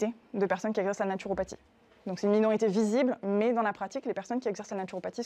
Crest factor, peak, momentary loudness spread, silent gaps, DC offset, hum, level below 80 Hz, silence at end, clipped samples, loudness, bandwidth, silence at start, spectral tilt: 16 dB; -14 dBFS; 10 LU; none; under 0.1%; none; -64 dBFS; 0 s; under 0.1%; -30 LUFS; 9.2 kHz; 0 s; -6 dB/octave